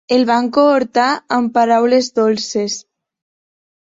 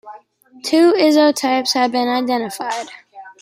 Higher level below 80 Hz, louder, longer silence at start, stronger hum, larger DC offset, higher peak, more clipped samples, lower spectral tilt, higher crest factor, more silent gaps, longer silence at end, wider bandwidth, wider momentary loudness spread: first, -62 dBFS vs -70 dBFS; about the same, -15 LUFS vs -16 LUFS; about the same, 0.1 s vs 0.05 s; neither; neither; about the same, -2 dBFS vs -2 dBFS; neither; first, -4 dB/octave vs -2.5 dB/octave; about the same, 14 dB vs 14 dB; neither; first, 1.2 s vs 0.1 s; second, 7.8 kHz vs 16 kHz; second, 7 LU vs 13 LU